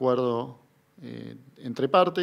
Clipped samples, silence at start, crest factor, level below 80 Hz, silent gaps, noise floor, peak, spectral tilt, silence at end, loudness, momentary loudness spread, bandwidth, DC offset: under 0.1%; 0 s; 20 dB; -76 dBFS; none; -56 dBFS; -8 dBFS; -7 dB/octave; 0 s; -26 LUFS; 21 LU; 11.5 kHz; under 0.1%